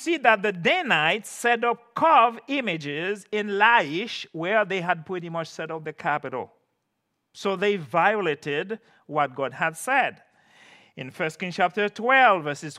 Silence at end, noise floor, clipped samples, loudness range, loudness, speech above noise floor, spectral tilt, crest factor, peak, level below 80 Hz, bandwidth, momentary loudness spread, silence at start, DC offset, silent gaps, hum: 0 s; -77 dBFS; under 0.1%; 6 LU; -23 LUFS; 53 dB; -4 dB/octave; 22 dB; -2 dBFS; -78 dBFS; 14.5 kHz; 13 LU; 0 s; under 0.1%; none; none